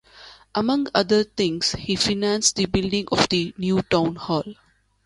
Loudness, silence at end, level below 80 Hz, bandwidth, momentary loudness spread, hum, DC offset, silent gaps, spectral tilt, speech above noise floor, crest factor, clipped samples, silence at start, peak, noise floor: -22 LUFS; 0.5 s; -46 dBFS; 11.5 kHz; 7 LU; none; under 0.1%; none; -4 dB/octave; 25 dB; 20 dB; under 0.1%; 0.15 s; -2 dBFS; -47 dBFS